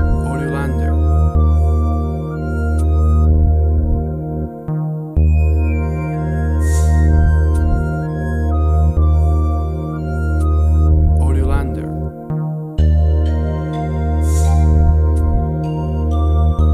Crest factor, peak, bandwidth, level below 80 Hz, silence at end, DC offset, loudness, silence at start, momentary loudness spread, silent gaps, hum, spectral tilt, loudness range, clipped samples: 12 dB; -2 dBFS; 10 kHz; -16 dBFS; 0 s; under 0.1%; -16 LUFS; 0 s; 8 LU; none; none; -8.5 dB/octave; 2 LU; under 0.1%